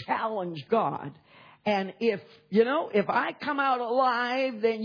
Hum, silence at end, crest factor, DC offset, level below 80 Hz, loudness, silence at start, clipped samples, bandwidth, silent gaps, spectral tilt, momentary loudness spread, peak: none; 0 s; 18 dB; under 0.1%; -80 dBFS; -27 LUFS; 0 s; under 0.1%; 5.4 kHz; none; -7 dB/octave; 9 LU; -10 dBFS